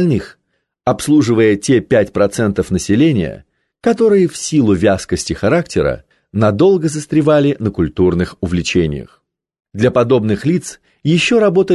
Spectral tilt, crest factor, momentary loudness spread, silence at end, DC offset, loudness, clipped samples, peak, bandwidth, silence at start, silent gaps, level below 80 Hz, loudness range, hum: -6 dB/octave; 12 dB; 8 LU; 0 s; under 0.1%; -14 LUFS; under 0.1%; -2 dBFS; 12.5 kHz; 0 s; none; -36 dBFS; 2 LU; none